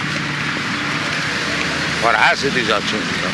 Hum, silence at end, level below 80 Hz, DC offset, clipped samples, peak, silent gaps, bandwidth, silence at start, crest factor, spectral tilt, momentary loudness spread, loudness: none; 0 s; -46 dBFS; under 0.1%; under 0.1%; -2 dBFS; none; 12 kHz; 0 s; 16 dB; -3.5 dB/octave; 6 LU; -17 LUFS